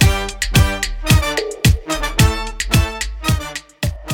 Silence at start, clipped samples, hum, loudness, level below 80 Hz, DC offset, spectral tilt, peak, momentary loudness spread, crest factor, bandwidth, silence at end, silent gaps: 0 s; under 0.1%; none; -17 LUFS; -22 dBFS; under 0.1%; -4.5 dB/octave; 0 dBFS; 8 LU; 16 dB; 19 kHz; 0 s; none